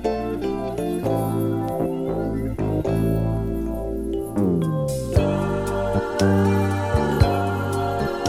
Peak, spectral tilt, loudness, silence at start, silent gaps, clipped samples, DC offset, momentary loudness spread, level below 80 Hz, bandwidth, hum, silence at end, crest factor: -2 dBFS; -7 dB/octave; -23 LUFS; 0 s; none; under 0.1%; under 0.1%; 6 LU; -34 dBFS; 16 kHz; none; 0 s; 18 dB